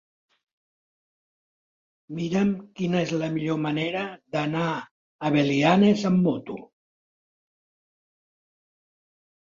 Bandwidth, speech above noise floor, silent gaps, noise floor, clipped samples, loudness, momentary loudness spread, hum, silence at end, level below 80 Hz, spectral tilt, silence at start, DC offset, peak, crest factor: 7.6 kHz; over 66 dB; 4.91-5.19 s; under -90 dBFS; under 0.1%; -24 LUFS; 13 LU; none; 2.9 s; -64 dBFS; -6.5 dB/octave; 2.1 s; under 0.1%; -6 dBFS; 20 dB